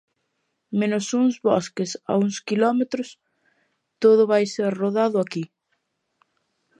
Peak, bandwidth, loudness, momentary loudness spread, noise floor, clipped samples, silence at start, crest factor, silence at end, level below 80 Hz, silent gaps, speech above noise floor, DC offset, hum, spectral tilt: -6 dBFS; 10.5 kHz; -22 LUFS; 11 LU; -75 dBFS; under 0.1%; 0.7 s; 18 dB; 1.35 s; -74 dBFS; none; 54 dB; under 0.1%; none; -5.5 dB/octave